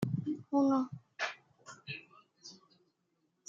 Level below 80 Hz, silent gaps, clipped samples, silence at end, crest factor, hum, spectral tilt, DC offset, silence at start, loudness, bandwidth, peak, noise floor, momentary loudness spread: -78 dBFS; none; under 0.1%; 0.95 s; 18 dB; none; -6.5 dB/octave; under 0.1%; 0 s; -35 LUFS; 7.6 kHz; -20 dBFS; -79 dBFS; 23 LU